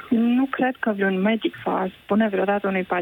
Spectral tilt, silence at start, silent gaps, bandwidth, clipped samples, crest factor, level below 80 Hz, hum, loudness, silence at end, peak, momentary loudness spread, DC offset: -8.5 dB/octave; 0 s; none; 17 kHz; under 0.1%; 14 dB; -62 dBFS; none; -22 LUFS; 0 s; -8 dBFS; 5 LU; under 0.1%